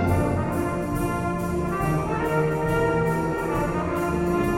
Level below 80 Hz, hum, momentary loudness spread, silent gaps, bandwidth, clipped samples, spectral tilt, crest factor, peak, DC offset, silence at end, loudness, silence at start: -38 dBFS; none; 4 LU; none; 16.5 kHz; under 0.1%; -7.5 dB/octave; 14 dB; -10 dBFS; under 0.1%; 0 s; -24 LUFS; 0 s